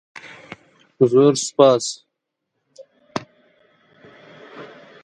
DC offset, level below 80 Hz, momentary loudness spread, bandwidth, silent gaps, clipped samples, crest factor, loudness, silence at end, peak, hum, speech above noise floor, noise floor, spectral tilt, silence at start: under 0.1%; -68 dBFS; 26 LU; 11 kHz; none; under 0.1%; 22 dB; -18 LUFS; 0.4 s; 0 dBFS; none; 63 dB; -78 dBFS; -5 dB/octave; 0.25 s